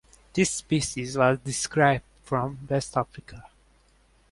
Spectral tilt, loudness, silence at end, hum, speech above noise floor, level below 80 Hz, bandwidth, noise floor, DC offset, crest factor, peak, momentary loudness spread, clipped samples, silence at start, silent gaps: -4.5 dB/octave; -26 LUFS; 0.85 s; none; 36 dB; -54 dBFS; 11.5 kHz; -61 dBFS; under 0.1%; 22 dB; -6 dBFS; 8 LU; under 0.1%; 0.35 s; none